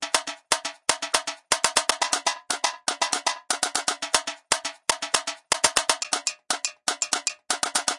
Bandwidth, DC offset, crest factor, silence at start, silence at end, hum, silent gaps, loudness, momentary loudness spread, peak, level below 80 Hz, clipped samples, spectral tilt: 12 kHz; under 0.1%; 24 dB; 0 s; 0 s; none; none; -24 LUFS; 5 LU; -4 dBFS; -64 dBFS; under 0.1%; 1 dB/octave